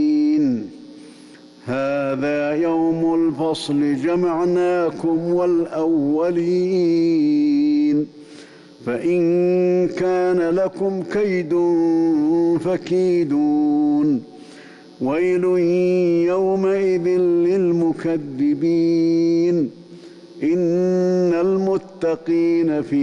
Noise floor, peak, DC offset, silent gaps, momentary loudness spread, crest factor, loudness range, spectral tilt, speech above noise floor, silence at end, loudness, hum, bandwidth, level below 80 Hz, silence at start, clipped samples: -44 dBFS; -12 dBFS; under 0.1%; none; 5 LU; 6 dB; 2 LU; -8 dB/octave; 26 dB; 0 s; -19 LUFS; none; 10.5 kHz; -60 dBFS; 0 s; under 0.1%